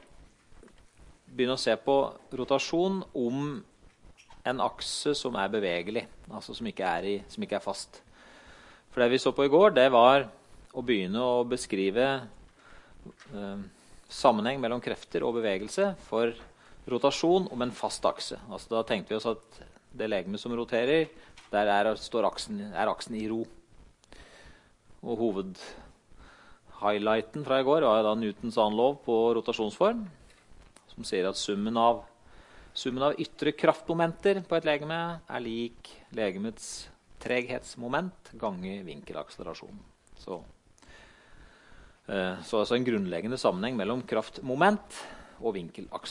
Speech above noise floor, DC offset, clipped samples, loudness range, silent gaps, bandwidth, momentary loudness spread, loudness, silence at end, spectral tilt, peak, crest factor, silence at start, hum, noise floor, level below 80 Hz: 28 dB; under 0.1%; under 0.1%; 11 LU; none; 11.5 kHz; 16 LU; -29 LUFS; 0 s; -5 dB/octave; -6 dBFS; 24 dB; 0.2 s; none; -57 dBFS; -58 dBFS